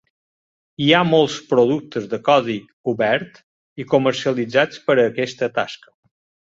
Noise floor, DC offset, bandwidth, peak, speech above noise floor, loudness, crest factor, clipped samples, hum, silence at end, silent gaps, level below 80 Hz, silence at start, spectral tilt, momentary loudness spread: under -90 dBFS; under 0.1%; 7.8 kHz; -2 dBFS; over 72 dB; -19 LUFS; 18 dB; under 0.1%; none; 0.75 s; 2.73-2.84 s, 3.43-3.76 s; -62 dBFS; 0.8 s; -5.5 dB/octave; 11 LU